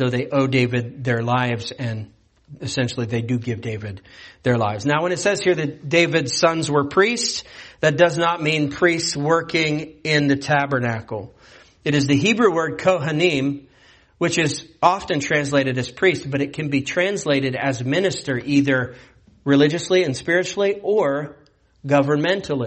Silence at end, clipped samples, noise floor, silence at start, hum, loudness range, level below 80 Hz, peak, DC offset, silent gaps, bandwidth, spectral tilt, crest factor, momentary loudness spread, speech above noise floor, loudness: 0 s; under 0.1%; -53 dBFS; 0 s; none; 4 LU; -54 dBFS; 0 dBFS; under 0.1%; none; 8.8 kHz; -5 dB/octave; 20 dB; 10 LU; 33 dB; -20 LUFS